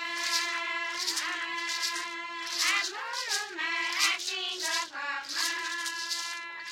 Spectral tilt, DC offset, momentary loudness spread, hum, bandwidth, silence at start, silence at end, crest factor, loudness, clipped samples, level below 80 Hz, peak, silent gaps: 2.5 dB/octave; under 0.1%; 8 LU; none; 16.5 kHz; 0 s; 0 s; 22 dB; -30 LUFS; under 0.1%; -84 dBFS; -12 dBFS; none